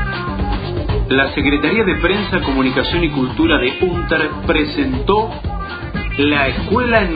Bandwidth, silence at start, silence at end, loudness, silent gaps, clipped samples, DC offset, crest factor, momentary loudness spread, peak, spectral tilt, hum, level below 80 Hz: 5 kHz; 0 s; 0 s; -16 LUFS; none; under 0.1%; under 0.1%; 16 dB; 8 LU; 0 dBFS; -9.5 dB/octave; none; -26 dBFS